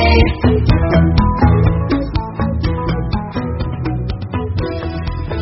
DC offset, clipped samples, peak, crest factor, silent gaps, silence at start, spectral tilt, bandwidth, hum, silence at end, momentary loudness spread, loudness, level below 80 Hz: under 0.1%; under 0.1%; 0 dBFS; 14 dB; none; 0 s; -6.5 dB/octave; 5.8 kHz; none; 0 s; 10 LU; -16 LUFS; -20 dBFS